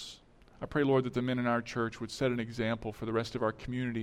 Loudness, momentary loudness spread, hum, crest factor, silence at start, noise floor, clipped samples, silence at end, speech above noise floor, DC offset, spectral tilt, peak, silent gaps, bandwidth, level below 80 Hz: -33 LUFS; 8 LU; none; 16 dB; 0 s; -56 dBFS; under 0.1%; 0 s; 24 dB; under 0.1%; -6.5 dB/octave; -18 dBFS; none; 13.5 kHz; -56 dBFS